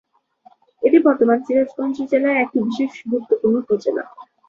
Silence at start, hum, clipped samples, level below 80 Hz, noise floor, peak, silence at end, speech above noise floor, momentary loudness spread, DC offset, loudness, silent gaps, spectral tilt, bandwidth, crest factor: 0.8 s; none; under 0.1%; -64 dBFS; -53 dBFS; -2 dBFS; 0.25 s; 35 dB; 10 LU; under 0.1%; -19 LUFS; none; -7 dB/octave; 7.2 kHz; 16 dB